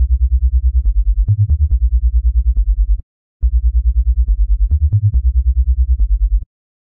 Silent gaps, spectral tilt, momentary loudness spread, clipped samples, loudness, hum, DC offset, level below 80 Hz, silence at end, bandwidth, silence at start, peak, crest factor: 3.03-3.40 s; -14.5 dB/octave; 4 LU; under 0.1%; -17 LUFS; none; under 0.1%; -14 dBFS; 0.45 s; 0.5 kHz; 0 s; -4 dBFS; 8 dB